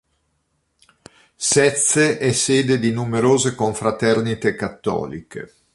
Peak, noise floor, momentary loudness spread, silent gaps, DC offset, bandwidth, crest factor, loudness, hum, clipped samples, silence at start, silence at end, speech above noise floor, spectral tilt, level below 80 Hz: -2 dBFS; -69 dBFS; 11 LU; none; under 0.1%; 11.5 kHz; 18 dB; -18 LUFS; none; under 0.1%; 1.4 s; 0.3 s; 50 dB; -4 dB/octave; -54 dBFS